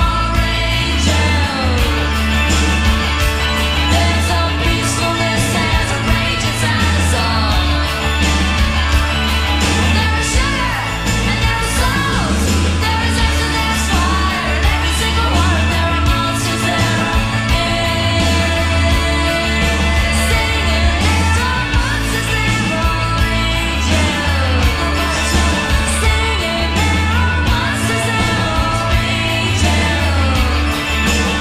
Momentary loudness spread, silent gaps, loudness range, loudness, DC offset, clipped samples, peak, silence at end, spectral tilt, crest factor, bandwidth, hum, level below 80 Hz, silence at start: 2 LU; none; 1 LU; -15 LUFS; under 0.1%; under 0.1%; -2 dBFS; 0 s; -4 dB/octave; 12 dB; 15.5 kHz; none; -20 dBFS; 0 s